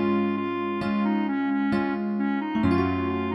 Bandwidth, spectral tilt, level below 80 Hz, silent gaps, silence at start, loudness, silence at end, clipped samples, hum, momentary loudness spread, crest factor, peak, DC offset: 5.8 kHz; -8.5 dB/octave; -54 dBFS; none; 0 s; -25 LUFS; 0 s; under 0.1%; none; 4 LU; 16 dB; -10 dBFS; under 0.1%